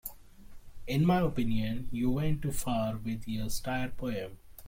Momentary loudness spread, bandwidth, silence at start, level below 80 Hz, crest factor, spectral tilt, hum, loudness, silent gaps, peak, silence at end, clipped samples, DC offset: 10 LU; 16.5 kHz; 0.05 s; -44 dBFS; 16 dB; -6 dB/octave; none; -32 LUFS; none; -16 dBFS; 0 s; under 0.1%; under 0.1%